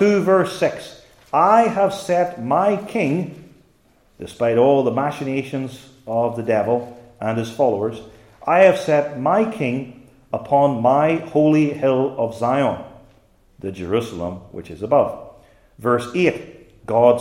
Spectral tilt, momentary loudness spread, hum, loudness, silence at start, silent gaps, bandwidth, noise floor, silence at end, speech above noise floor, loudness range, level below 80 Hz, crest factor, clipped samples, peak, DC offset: -7 dB/octave; 17 LU; none; -19 LUFS; 0 s; none; 15.5 kHz; -57 dBFS; 0 s; 39 dB; 5 LU; -58 dBFS; 18 dB; under 0.1%; 0 dBFS; under 0.1%